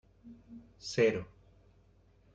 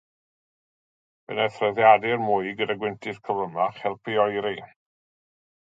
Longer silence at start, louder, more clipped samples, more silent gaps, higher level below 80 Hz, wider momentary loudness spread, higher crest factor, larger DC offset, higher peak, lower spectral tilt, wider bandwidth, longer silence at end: second, 0.25 s vs 1.3 s; second, -32 LUFS vs -24 LUFS; neither; neither; first, -64 dBFS vs -70 dBFS; first, 26 LU vs 14 LU; about the same, 20 dB vs 24 dB; neither; second, -18 dBFS vs -2 dBFS; second, -5 dB/octave vs -6.5 dB/octave; about the same, 8.4 kHz vs 7.8 kHz; about the same, 1.1 s vs 1.05 s